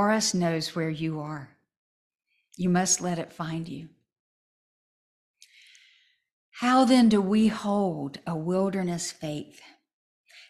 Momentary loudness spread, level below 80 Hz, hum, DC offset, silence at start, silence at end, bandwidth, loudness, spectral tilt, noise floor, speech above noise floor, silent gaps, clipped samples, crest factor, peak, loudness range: 16 LU; -64 dBFS; none; under 0.1%; 0 s; 0.1 s; 14 kHz; -26 LUFS; -4.5 dB/octave; -63 dBFS; 38 dB; 1.77-2.10 s, 4.19-5.34 s, 6.33-6.52 s, 9.93-10.24 s; under 0.1%; 18 dB; -10 dBFS; 12 LU